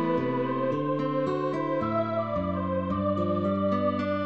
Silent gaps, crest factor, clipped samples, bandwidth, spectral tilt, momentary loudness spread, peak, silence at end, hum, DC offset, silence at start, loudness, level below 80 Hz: none; 12 dB; under 0.1%; 7.8 kHz; -9 dB/octave; 2 LU; -14 dBFS; 0 s; none; 0.2%; 0 s; -28 LUFS; -56 dBFS